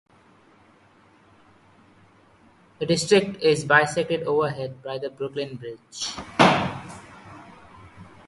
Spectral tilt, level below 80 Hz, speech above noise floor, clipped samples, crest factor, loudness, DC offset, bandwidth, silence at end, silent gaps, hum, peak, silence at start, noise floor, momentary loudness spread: -4.5 dB/octave; -58 dBFS; 33 dB; under 0.1%; 26 dB; -23 LUFS; under 0.1%; 11.5 kHz; 0.25 s; none; none; 0 dBFS; 2.8 s; -56 dBFS; 23 LU